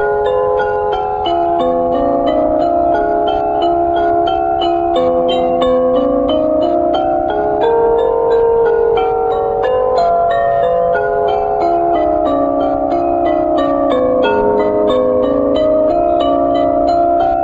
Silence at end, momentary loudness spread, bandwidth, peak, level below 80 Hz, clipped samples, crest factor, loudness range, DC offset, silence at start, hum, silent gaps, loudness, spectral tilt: 0 s; 2 LU; 7.8 kHz; -2 dBFS; -36 dBFS; under 0.1%; 12 dB; 1 LU; under 0.1%; 0 s; none; none; -13 LUFS; -7.5 dB/octave